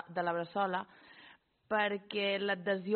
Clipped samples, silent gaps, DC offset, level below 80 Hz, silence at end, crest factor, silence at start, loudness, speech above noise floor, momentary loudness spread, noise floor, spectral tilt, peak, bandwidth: under 0.1%; none; under 0.1%; -80 dBFS; 0 s; 18 dB; 0 s; -34 LUFS; 27 dB; 16 LU; -61 dBFS; -2.5 dB/octave; -18 dBFS; 4.5 kHz